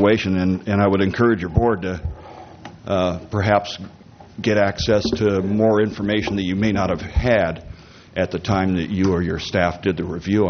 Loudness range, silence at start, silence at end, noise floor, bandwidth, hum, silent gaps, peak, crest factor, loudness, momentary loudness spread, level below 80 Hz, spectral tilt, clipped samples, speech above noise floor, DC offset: 2 LU; 0 s; 0 s; -39 dBFS; 6.6 kHz; none; none; 0 dBFS; 18 dB; -20 LUFS; 15 LU; -36 dBFS; -5.5 dB/octave; under 0.1%; 20 dB; under 0.1%